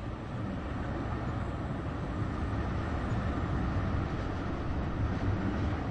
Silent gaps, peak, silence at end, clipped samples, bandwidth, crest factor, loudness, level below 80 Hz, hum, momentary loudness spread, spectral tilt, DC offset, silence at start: none; -20 dBFS; 0 s; under 0.1%; 8.8 kHz; 14 dB; -34 LUFS; -40 dBFS; none; 4 LU; -8 dB/octave; under 0.1%; 0 s